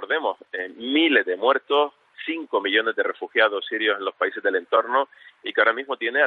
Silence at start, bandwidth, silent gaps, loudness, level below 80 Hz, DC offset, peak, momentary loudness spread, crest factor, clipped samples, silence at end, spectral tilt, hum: 0 s; 4.6 kHz; none; -22 LUFS; -82 dBFS; under 0.1%; -4 dBFS; 11 LU; 18 dB; under 0.1%; 0 s; -5 dB/octave; none